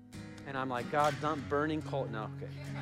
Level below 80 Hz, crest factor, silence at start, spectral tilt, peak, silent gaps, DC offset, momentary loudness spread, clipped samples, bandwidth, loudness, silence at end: -66 dBFS; 18 dB; 0 s; -6 dB/octave; -16 dBFS; none; under 0.1%; 12 LU; under 0.1%; 15.5 kHz; -35 LUFS; 0 s